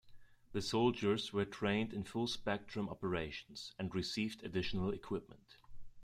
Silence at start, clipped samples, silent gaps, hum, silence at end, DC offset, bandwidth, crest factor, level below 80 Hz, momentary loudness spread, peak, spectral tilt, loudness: 0.05 s; under 0.1%; none; none; 0 s; under 0.1%; 14 kHz; 20 dB; -60 dBFS; 10 LU; -20 dBFS; -5.5 dB/octave; -39 LUFS